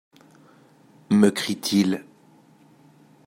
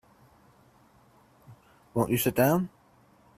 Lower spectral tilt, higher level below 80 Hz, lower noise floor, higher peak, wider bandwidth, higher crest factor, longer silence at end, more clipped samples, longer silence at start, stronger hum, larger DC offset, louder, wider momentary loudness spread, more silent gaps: about the same, -5 dB/octave vs -5.5 dB/octave; second, -70 dBFS vs -60 dBFS; second, -55 dBFS vs -61 dBFS; first, -4 dBFS vs -10 dBFS; about the same, 16 kHz vs 16 kHz; about the same, 22 dB vs 22 dB; first, 1.25 s vs 0.7 s; neither; second, 1.1 s vs 1.5 s; neither; neither; first, -22 LUFS vs -27 LUFS; second, 7 LU vs 11 LU; neither